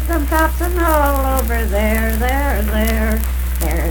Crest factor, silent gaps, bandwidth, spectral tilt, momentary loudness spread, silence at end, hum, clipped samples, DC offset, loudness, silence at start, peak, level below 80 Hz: 14 dB; none; 19.5 kHz; -5.5 dB/octave; 4 LU; 0 s; none; under 0.1%; under 0.1%; -17 LUFS; 0 s; 0 dBFS; -18 dBFS